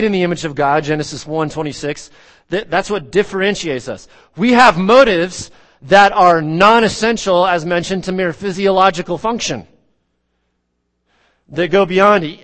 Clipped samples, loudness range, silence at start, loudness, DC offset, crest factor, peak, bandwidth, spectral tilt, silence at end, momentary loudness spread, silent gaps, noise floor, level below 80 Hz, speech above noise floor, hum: 0.1%; 8 LU; 0 s; -14 LUFS; under 0.1%; 14 dB; 0 dBFS; 10.5 kHz; -4.5 dB/octave; 0.1 s; 14 LU; none; -68 dBFS; -44 dBFS; 54 dB; none